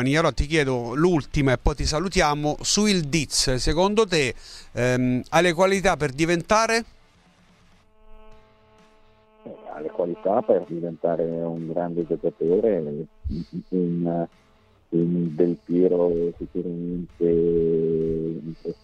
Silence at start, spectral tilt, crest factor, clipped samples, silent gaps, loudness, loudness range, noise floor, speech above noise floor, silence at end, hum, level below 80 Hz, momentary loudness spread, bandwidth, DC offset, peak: 0 s; -5 dB/octave; 18 dB; under 0.1%; none; -23 LUFS; 7 LU; -57 dBFS; 34 dB; 0.1 s; none; -38 dBFS; 12 LU; 13.5 kHz; under 0.1%; -4 dBFS